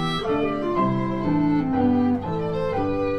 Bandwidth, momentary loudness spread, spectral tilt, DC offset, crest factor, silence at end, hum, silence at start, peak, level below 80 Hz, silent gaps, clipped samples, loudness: 9.8 kHz; 5 LU; -8 dB/octave; under 0.1%; 12 dB; 0 s; none; 0 s; -10 dBFS; -42 dBFS; none; under 0.1%; -23 LUFS